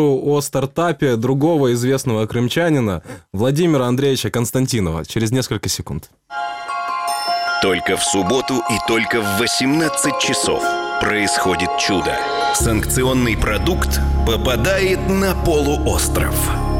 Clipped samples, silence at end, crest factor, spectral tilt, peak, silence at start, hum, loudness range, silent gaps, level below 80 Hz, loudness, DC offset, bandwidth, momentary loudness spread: under 0.1%; 0 s; 16 dB; -4.5 dB/octave; -2 dBFS; 0 s; none; 3 LU; none; -28 dBFS; -17 LUFS; under 0.1%; 17 kHz; 5 LU